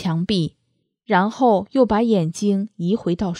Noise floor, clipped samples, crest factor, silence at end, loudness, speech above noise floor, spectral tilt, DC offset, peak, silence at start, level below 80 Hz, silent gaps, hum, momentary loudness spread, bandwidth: -69 dBFS; under 0.1%; 16 dB; 0 s; -20 LUFS; 50 dB; -6.5 dB/octave; under 0.1%; -4 dBFS; 0 s; -48 dBFS; none; none; 6 LU; 11 kHz